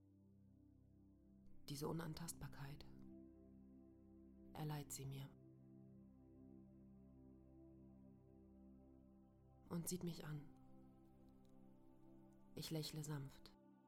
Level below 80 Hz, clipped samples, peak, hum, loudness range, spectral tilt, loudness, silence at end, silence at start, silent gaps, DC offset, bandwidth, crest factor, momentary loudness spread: -72 dBFS; under 0.1%; -34 dBFS; none; 11 LU; -5 dB/octave; -52 LUFS; 0 s; 0 s; none; under 0.1%; 16 kHz; 22 dB; 20 LU